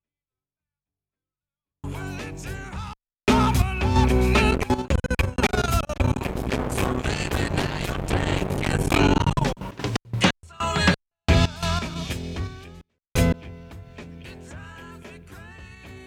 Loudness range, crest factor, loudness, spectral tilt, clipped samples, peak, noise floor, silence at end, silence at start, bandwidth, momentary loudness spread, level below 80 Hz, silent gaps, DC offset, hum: 9 LU; 20 dB; -24 LUFS; -5.5 dB/octave; under 0.1%; -6 dBFS; under -90 dBFS; 0 s; 1.85 s; 17 kHz; 22 LU; -32 dBFS; none; under 0.1%; none